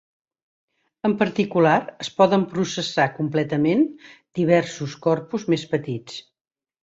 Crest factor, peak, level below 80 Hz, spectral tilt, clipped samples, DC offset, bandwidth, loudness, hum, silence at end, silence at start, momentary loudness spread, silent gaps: 18 dB; -4 dBFS; -64 dBFS; -6 dB/octave; under 0.1%; under 0.1%; 8 kHz; -22 LUFS; none; 0.65 s; 1.05 s; 12 LU; none